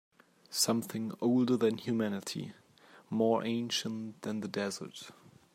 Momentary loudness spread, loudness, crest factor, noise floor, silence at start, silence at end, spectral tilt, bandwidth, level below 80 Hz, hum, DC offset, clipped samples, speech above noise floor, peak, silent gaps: 13 LU; -33 LUFS; 20 dB; -60 dBFS; 0.5 s; 0.45 s; -4.5 dB/octave; 16 kHz; -80 dBFS; none; under 0.1%; under 0.1%; 27 dB; -14 dBFS; none